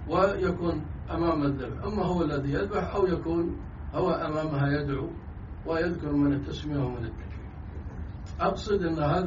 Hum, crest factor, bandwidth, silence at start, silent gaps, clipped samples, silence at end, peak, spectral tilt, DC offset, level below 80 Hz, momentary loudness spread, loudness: none; 18 dB; 7.4 kHz; 0 s; none; under 0.1%; 0 s; -10 dBFS; -6.5 dB/octave; under 0.1%; -42 dBFS; 13 LU; -29 LUFS